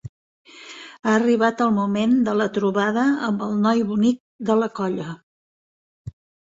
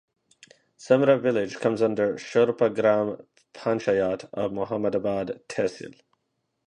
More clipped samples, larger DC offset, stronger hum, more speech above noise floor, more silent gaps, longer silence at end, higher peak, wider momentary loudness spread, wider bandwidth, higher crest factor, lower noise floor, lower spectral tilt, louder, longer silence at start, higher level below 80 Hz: neither; neither; neither; second, 21 dB vs 53 dB; first, 0.09-0.45 s, 4.20-4.39 s, 5.23-6.05 s vs none; second, 0.4 s vs 0.75 s; about the same, -4 dBFS vs -6 dBFS; first, 20 LU vs 10 LU; second, 7.8 kHz vs 10 kHz; about the same, 18 dB vs 20 dB; second, -41 dBFS vs -77 dBFS; about the same, -6.5 dB/octave vs -6.5 dB/octave; first, -21 LUFS vs -25 LUFS; second, 0.05 s vs 0.8 s; first, -58 dBFS vs -64 dBFS